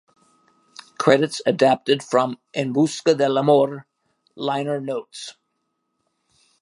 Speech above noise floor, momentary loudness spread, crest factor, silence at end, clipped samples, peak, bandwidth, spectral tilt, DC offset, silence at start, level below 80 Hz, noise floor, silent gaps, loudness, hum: 55 dB; 12 LU; 20 dB; 1.3 s; under 0.1%; -2 dBFS; 11.5 kHz; -5 dB/octave; under 0.1%; 1 s; -74 dBFS; -74 dBFS; none; -20 LUFS; none